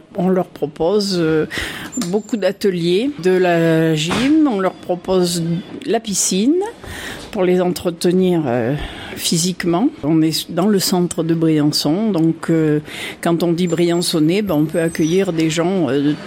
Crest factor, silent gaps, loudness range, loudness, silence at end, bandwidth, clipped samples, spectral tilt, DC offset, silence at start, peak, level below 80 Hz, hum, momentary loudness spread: 12 dB; none; 2 LU; -17 LUFS; 0 s; 16.5 kHz; under 0.1%; -5 dB/octave; under 0.1%; 0.1 s; -6 dBFS; -46 dBFS; none; 7 LU